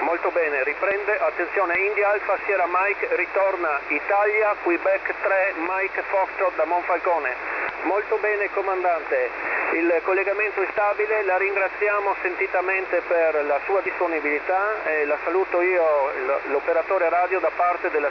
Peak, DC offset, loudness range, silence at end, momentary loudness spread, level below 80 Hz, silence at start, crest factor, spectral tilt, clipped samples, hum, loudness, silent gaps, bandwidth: -8 dBFS; under 0.1%; 2 LU; 0 s; 3 LU; -58 dBFS; 0 s; 14 dB; -5.5 dB/octave; under 0.1%; none; -22 LUFS; none; 5.4 kHz